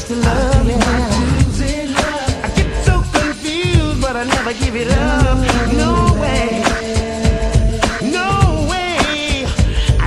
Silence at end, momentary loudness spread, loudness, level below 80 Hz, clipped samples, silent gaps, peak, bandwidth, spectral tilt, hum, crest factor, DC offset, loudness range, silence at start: 0 s; 4 LU; -16 LUFS; -20 dBFS; under 0.1%; none; 0 dBFS; 12.5 kHz; -5 dB/octave; none; 14 dB; under 0.1%; 1 LU; 0 s